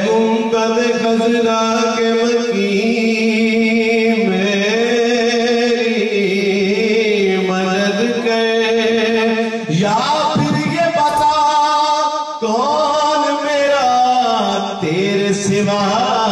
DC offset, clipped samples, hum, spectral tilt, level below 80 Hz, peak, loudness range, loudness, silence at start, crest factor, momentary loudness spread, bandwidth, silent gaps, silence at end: under 0.1%; under 0.1%; none; -4.5 dB/octave; -56 dBFS; -4 dBFS; 1 LU; -15 LUFS; 0 s; 10 dB; 3 LU; 12.5 kHz; none; 0 s